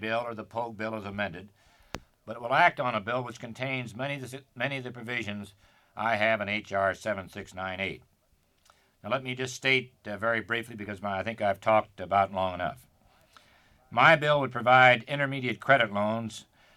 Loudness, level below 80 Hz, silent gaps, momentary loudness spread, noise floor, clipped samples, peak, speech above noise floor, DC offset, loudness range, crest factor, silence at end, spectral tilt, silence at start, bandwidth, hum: -27 LUFS; -66 dBFS; none; 18 LU; -69 dBFS; under 0.1%; -6 dBFS; 40 dB; under 0.1%; 8 LU; 22 dB; 0.35 s; -5 dB/octave; 0 s; 15 kHz; none